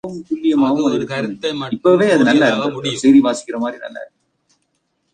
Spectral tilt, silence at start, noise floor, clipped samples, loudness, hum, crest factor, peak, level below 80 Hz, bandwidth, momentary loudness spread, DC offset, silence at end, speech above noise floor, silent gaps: -5 dB/octave; 0.05 s; -68 dBFS; under 0.1%; -16 LUFS; none; 16 dB; -2 dBFS; -58 dBFS; 9.6 kHz; 13 LU; under 0.1%; 1.1 s; 52 dB; none